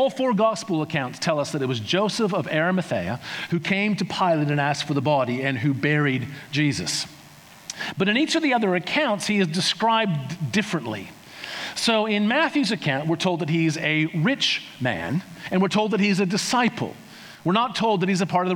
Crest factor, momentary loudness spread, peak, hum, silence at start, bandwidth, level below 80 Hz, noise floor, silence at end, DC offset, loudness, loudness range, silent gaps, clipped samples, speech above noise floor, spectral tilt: 18 dB; 9 LU; -6 dBFS; none; 0 s; 19.5 kHz; -66 dBFS; -47 dBFS; 0 s; under 0.1%; -23 LUFS; 2 LU; none; under 0.1%; 24 dB; -5 dB/octave